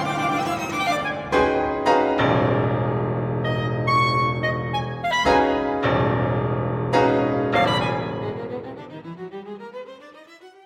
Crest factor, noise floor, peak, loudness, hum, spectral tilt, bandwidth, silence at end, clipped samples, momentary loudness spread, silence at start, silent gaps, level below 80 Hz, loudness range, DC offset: 16 dB; -46 dBFS; -6 dBFS; -22 LUFS; none; -6 dB/octave; 15 kHz; 0.15 s; under 0.1%; 17 LU; 0 s; none; -46 dBFS; 3 LU; under 0.1%